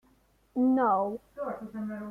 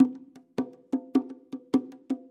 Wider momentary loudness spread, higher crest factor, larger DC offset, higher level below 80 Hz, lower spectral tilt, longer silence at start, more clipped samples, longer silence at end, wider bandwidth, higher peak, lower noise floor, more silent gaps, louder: about the same, 13 LU vs 13 LU; second, 14 dB vs 20 dB; neither; first, -66 dBFS vs -76 dBFS; first, -9 dB/octave vs -7.5 dB/octave; first, 0.55 s vs 0 s; neither; second, 0 s vs 0.15 s; second, 3.3 kHz vs 8.4 kHz; second, -16 dBFS vs -8 dBFS; first, -66 dBFS vs -45 dBFS; neither; about the same, -30 LUFS vs -31 LUFS